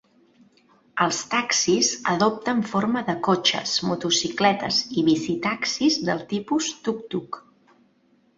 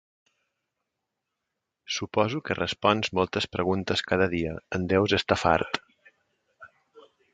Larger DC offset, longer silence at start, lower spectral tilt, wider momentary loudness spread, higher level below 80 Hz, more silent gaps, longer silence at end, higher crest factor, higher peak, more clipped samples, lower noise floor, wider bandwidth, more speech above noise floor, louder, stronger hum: neither; second, 0.95 s vs 1.9 s; second, -3 dB/octave vs -5 dB/octave; about the same, 8 LU vs 9 LU; second, -64 dBFS vs -50 dBFS; neither; first, 1 s vs 0.35 s; about the same, 20 dB vs 24 dB; about the same, -4 dBFS vs -4 dBFS; neither; second, -62 dBFS vs -84 dBFS; second, 8 kHz vs 9.2 kHz; second, 39 dB vs 58 dB; first, -23 LUFS vs -26 LUFS; neither